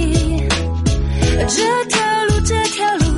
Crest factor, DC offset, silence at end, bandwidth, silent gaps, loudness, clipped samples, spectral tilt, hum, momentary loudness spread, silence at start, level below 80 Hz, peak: 14 dB; under 0.1%; 0 s; 11.5 kHz; none; -16 LUFS; under 0.1%; -4.5 dB/octave; none; 3 LU; 0 s; -22 dBFS; -2 dBFS